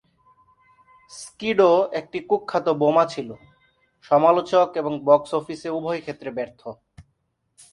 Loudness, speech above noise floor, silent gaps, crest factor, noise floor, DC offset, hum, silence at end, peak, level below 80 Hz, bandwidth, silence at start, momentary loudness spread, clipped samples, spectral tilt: -21 LUFS; 50 dB; none; 20 dB; -72 dBFS; under 0.1%; none; 0.7 s; -2 dBFS; -64 dBFS; 11.5 kHz; 1.1 s; 19 LU; under 0.1%; -6 dB/octave